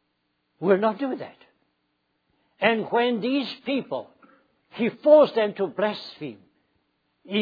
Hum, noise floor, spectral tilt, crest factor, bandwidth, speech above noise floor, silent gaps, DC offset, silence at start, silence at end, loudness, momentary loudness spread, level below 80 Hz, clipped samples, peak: 60 Hz at -65 dBFS; -74 dBFS; -7.5 dB/octave; 22 dB; 5 kHz; 51 dB; none; under 0.1%; 0.6 s; 0 s; -23 LUFS; 19 LU; -80 dBFS; under 0.1%; -4 dBFS